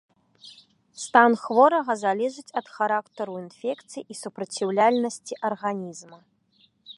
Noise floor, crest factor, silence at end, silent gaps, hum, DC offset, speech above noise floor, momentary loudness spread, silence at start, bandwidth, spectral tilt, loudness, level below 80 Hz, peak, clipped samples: -64 dBFS; 24 dB; 0.05 s; none; none; under 0.1%; 40 dB; 17 LU; 0.45 s; 11.5 kHz; -4 dB/octave; -24 LUFS; -80 dBFS; -2 dBFS; under 0.1%